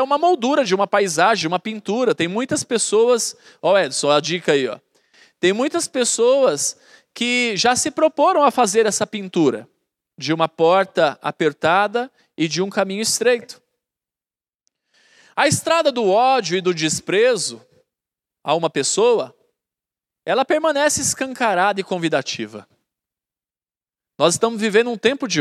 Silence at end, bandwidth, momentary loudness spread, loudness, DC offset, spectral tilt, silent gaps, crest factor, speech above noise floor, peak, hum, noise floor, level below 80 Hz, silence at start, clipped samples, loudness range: 0 s; 14.5 kHz; 8 LU; -18 LUFS; under 0.1%; -3 dB/octave; none; 18 dB; over 72 dB; 0 dBFS; none; under -90 dBFS; -66 dBFS; 0 s; under 0.1%; 4 LU